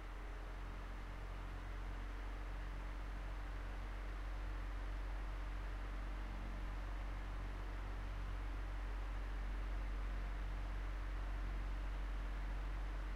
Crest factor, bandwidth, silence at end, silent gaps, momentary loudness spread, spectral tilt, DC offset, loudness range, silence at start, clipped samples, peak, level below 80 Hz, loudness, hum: 10 dB; 7.4 kHz; 0 s; none; 4 LU; -6 dB/octave; under 0.1%; 3 LU; 0 s; under 0.1%; -34 dBFS; -44 dBFS; -48 LUFS; none